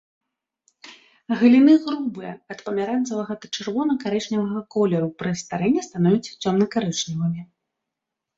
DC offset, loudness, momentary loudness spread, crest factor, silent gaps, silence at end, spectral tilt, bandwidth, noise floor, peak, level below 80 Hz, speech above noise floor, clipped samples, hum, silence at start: under 0.1%; -22 LUFS; 13 LU; 18 dB; none; 0.95 s; -6 dB/octave; 7.8 kHz; -84 dBFS; -4 dBFS; -64 dBFS; 63 dB; under 0.1%; none; 0.85 s